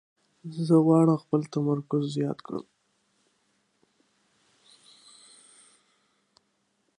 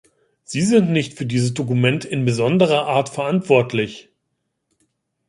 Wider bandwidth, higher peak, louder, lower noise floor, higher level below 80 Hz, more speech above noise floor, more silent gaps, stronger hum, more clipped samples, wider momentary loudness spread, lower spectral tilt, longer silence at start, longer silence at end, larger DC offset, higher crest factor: about the same, 10.5 kHz vs 11.5 kHz; second, -10 dBFS vs -2 dBFS; second, -25 LUFS vs -19 LUFS; about the same, -73 dBFS vs -74 dBFS; second, -76 dBFS vs -58 dBFS; second, 49 dB vs 56 dB; neither; neither; neither; first, 18 LU vs 7 LU; first, -8.5 dB/octave vs -6 dB/octave; about the same, 0.45 s vs 0.5 s; first, 4.35 s vs 1.3 s; neither; about the same, 20 dB vs 18 dB